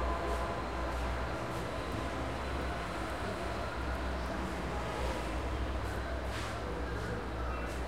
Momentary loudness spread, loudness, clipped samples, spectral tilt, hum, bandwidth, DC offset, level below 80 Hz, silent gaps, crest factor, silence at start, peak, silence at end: 2 LU; -37 LUFS; under 0.1%; -5.5 dB/octave; none; 15.5 kHz; 0.3%; -40 dBFS; none; 14 dB; 0 s; -22 dBFS; 0 s